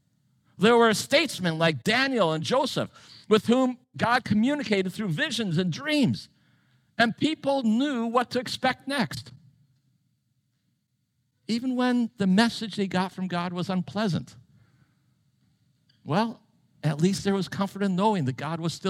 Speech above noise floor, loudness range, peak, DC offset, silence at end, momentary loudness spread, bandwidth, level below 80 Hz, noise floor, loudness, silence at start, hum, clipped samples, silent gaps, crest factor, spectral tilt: 49 dB; 8 LU; -8 dBFS; under 0.1%; 0 s; 8 LU; 15.5 kHz; -66 dBFS; -74 dBFS; -25 LUFS; 0.6 s; none; under 0.1%; none; 20 dB; -5.5 dB/octave